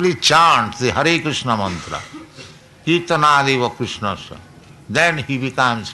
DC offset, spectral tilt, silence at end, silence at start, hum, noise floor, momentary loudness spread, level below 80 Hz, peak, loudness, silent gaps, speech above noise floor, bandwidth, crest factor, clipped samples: under 0.1%; -4 dB/octave; 0 s; 0 s; none; -40 dBFS; 16 LU; -50 dBFS; -4 dBFS; -16 LUFS; none; 23 dB; 12 kHz; 16 dB; under 0.1%